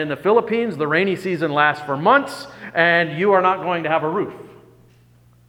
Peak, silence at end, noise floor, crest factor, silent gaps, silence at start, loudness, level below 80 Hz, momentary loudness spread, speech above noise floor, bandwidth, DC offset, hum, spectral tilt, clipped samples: 0 dBFS; 0.95 s; -52 dBFS; 18 dB; none; 0 s; -18 LUFS; -64 dBFS; 9 LU; 33 dB; 16.5 kHz; under 0.1%; none; -6 dB/octave; under 0.1%